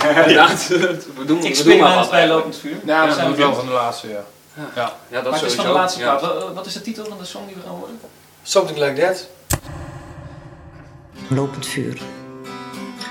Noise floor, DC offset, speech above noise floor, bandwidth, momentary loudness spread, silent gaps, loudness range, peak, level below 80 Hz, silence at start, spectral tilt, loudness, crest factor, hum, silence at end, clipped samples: -41 dBFS; under 0.1%; 24 dB; 17 kHz; 23 LU; none; 11 LU; 0 dBFS; -48 dBFS; 0 s; -4 dB/octave; -17 LUFS; 18 dB; none; 0 s; under 0.1%